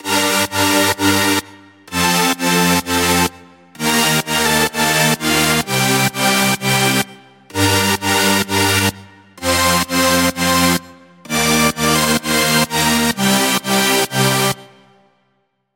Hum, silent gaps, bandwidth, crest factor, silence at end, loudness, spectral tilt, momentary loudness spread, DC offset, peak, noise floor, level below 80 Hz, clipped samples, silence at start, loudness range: none; none; 17 kHz; 14 dB; 1.1 s; -14 LUFS; -3 dB/octave; 4 LU; under 0.1%; -2 dBFS; -65 dBFS; -44 dBFS; under 0.1%; 0.05 s; 1 LU